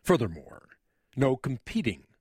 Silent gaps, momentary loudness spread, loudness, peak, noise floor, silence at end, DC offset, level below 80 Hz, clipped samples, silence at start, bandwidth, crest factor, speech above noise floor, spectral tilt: none; 12 LU; -29 LUFS; -10 dBFS; -63 dBFS; 0.25 s; under 0.1%; -54 dBFS; under 0.1%; 0.05 s; 16 kHz; 20 dB; 35 dB; -6.5 dB/octave